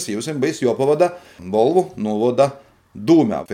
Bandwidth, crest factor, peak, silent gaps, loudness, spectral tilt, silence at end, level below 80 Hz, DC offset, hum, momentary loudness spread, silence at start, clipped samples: 15 kHz; 16 dB; -2 dBFS; none; -18 LUFS; -6 dB/octave; 0 s; -60 dBFS; under 0.1%; none; 8 LU; 0 s; under 0.1%